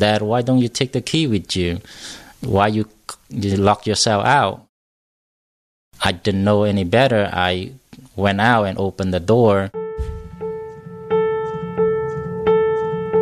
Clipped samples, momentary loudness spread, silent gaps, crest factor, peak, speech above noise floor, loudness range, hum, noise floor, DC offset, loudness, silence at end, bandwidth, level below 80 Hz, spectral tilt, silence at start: under 0.1%; 15 LU; 4.69-5.91 s; 18 dB; -2 dBFS; over 72 dB; 3 LU; none; under -90 dBFS; under 0.1%; -18 LUFS; 0 s; 14 kHz; -42 dBFS; -5.5 dB/octave; 0 s